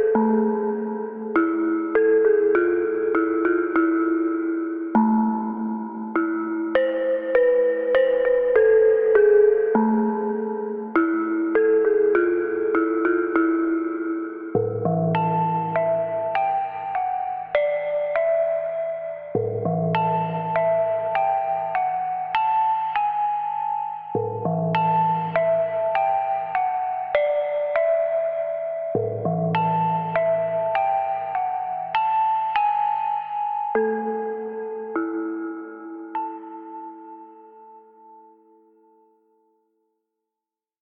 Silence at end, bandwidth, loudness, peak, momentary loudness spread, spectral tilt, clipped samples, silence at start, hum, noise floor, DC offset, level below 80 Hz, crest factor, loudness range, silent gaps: 2.65 s; 4.9 kHz; -22 LUFS; -6 dBFS; 9 LU; -10.5 dB/octave; under 0.1%; 0 s; none; -88 dBFS; under 0.1%; -62 dBFS; 16 dB; 7 LU; none